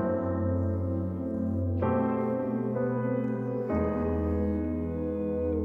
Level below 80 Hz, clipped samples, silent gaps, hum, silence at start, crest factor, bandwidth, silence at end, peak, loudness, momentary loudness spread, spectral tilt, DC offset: -44 dBFS; under 0.1%; none; none; 0 s; 12 dB; 3.4 kHz; 0 s; -16 dBFS; -30 LUFS; 4 LU; -11.5 dB/octave; under 0.1%